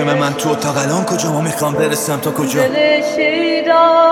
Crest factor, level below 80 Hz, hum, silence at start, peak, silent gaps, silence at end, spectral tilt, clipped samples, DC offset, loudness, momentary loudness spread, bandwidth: 14 dB; -56 dBFS; none; 0 s; 0 dBFS; none; 0 s; -4.5 dB/octave; under 0.1%; under 0.1%; -14 LUFS; 6 LU; 18.5 kHz